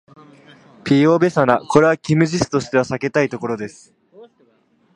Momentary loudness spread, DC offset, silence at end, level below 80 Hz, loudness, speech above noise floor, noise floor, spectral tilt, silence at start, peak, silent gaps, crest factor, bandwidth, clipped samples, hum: 11 LU; under 0.1%; 0.7 s; -52 dBFS; -17 LUFS; 42 dB; -59 dBFS; -6.5 dB/octave; 0.85 s; 0 dBFS; none; 18 dB; 11 kHz; under 0.1%; none